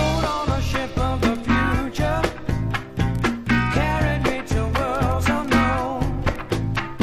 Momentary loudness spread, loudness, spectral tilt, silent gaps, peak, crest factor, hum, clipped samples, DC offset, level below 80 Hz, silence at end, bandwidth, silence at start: 5 LU; -22 LUFS; -6 dB/octave; none; -6 dBFS; 16 dB; none; under 0.1%; under 0.1%; -30 dBFS; 0 s; 15.5 kHz; 0 s